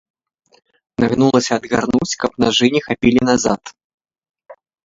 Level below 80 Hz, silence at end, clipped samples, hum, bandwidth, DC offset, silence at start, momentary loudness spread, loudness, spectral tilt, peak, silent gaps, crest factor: -48 dBFS; 0.3 s; under 0.1%; none; 7.8 kHz; under 0.1%; 1 s; 7 LU; -16 LUFS; -4.5 dB/octave; 0 dBFS; 3.84-3.98 s; 18 dB